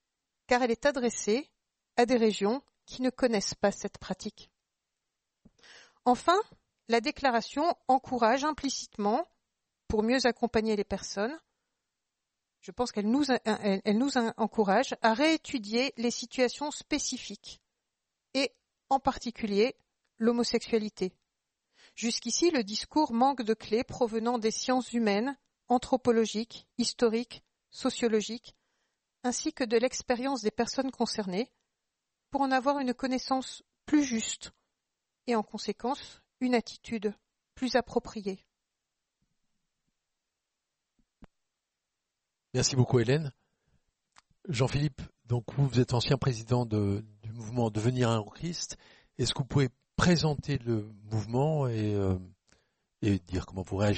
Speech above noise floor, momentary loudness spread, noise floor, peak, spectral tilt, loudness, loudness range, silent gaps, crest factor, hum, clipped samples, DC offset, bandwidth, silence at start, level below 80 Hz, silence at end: 57 dB; 12 LU; -86 dBFS; -10 dBFS; -5 dB/octave; -30 LUFS; 5 LU; none; 22 dB; none; under 0.1%; under 0.1%; 8.4 kHz; 0.5 s; -56 dBFS; 0 s